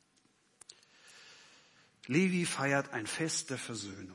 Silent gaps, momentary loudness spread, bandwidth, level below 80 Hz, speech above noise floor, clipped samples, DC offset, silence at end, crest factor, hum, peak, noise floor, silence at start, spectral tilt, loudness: none; 25 LU; 11.5 kHz; -82 dBFS; 37 dB; under 0.1%; under 0.1%; 0 s; 20 dB; none; -16 dBFS; -71 dBFS; 1.05 s; -4 dB/octave; -33 LUFS